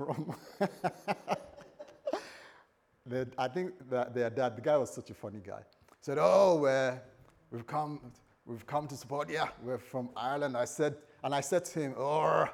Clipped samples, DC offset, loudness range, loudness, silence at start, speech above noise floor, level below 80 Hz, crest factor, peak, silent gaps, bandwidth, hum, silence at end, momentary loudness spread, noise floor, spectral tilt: under 0.1%; under 0.1%; 8 LU; -33 LUFS; 0 s; 33 dB; -74 dBFS; 22 dB; -12 dBFS; none; 16 kHz; none; 0 s; 18 LU; -66 dBFS; -5.5 dB/octave